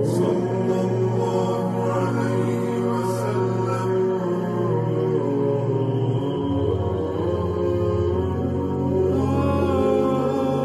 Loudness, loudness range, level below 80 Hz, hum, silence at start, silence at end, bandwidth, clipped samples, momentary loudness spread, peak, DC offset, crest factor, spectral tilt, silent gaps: -22 LUFS; 1 LU; -44 dBFS; none; 0 s; 0 s; 13 kHz; under 0.1%; 3 LU; -8 dBFS; under 0.1%; 12 dB; -8.5 dB/octave; none